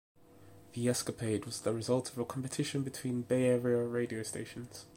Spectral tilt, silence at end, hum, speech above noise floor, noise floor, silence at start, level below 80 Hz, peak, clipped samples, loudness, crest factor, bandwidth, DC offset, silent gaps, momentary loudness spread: -5.5 dB/octave; 0 s; none; 23 dB; -57 dBFS; 0.35 s; -70 dBFS; -18 dBFS; under 0.1%; -35 LUFS; 18 dB; 16.5 kHz; under 0.1%; none; 10 LU